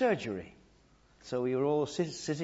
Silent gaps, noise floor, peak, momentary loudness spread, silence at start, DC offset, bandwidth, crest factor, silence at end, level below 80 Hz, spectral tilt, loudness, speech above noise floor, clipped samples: none; -64 dBFS; -16 dBFS; 16 LU; 0 s; under 0.1%; 8 kHz; 16 dB; 0 s; -66 dBFS; -5.5 dB/octave; -33 LUFS; 32 dB; under 0.1%